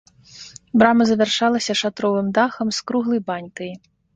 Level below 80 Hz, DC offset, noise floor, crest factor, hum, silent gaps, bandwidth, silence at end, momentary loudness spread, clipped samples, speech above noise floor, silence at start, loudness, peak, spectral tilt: -58 dBFS; under 0.1%; -43 dBFS; 18 dB; none; none; 9 kHz; 0.4 s; 18 LU; under 0.1%; 24 dB; 0.35 s; -19 LUFS; -2 dBFS; -4.5 dB/octave